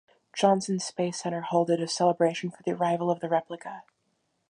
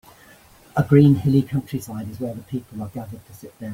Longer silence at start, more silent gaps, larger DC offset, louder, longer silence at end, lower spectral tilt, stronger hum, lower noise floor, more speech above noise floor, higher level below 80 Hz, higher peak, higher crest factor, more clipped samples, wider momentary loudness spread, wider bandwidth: second, 0.35 s vs 0.75 s; neither; neither; second, -27 LUFS vs -20 LUFS; first, 0.7 s vs 0 s; second, -5 dB/octave vs -8.5 dB/octave; neither; first, -75 dBFS vs -50 dBFS; first, 48 dB vs 29 dB; second, -78 dBFS vs -52 dBFS; second, -8 dBFS vs -2 dBFS; about the same, 20 dB vs 18 dB; neither; second, 15 LU vs 21 LU; second, 10.5 kHz vs 16.5 kHz